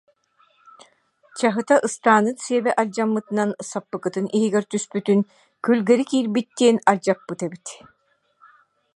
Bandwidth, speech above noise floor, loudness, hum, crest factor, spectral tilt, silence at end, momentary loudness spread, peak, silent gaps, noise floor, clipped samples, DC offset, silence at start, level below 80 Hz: 11.5 kHz; 41 dB; -21 LUFS; none; 22 dB; -5 dB/octave; 1.2 s; 12 LU; 0 dBFS; none; -61 dBFS; under 0.1%; under 0.1%; 1.35 s; -74 dBFS